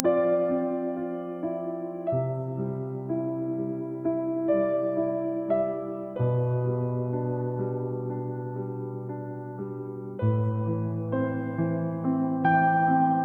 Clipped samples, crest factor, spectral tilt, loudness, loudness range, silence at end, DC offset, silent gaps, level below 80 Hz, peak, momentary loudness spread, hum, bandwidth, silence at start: under 0.1%; 24 dB; -11.5 dB/octave; -28 LUFS; 4 LU; 0 s; under 0.1%; none; -66 dBFS; -2 dBFS; 11 LU; none; 3.7 kHz; 0 s